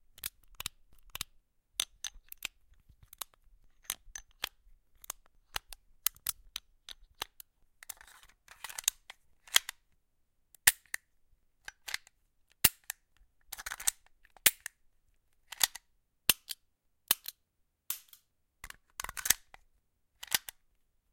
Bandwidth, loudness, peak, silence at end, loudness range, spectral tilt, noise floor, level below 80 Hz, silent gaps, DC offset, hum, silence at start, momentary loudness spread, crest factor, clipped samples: 17 kHz; -33 LUFS; -2 dBFS; 0.75 s; 10 LU; 1.5 dB/octave; -78 dBFS; -62 dBFS; none; under 0.1%; none; 0.25 s; 21 LU; 38 dB; under 0.1%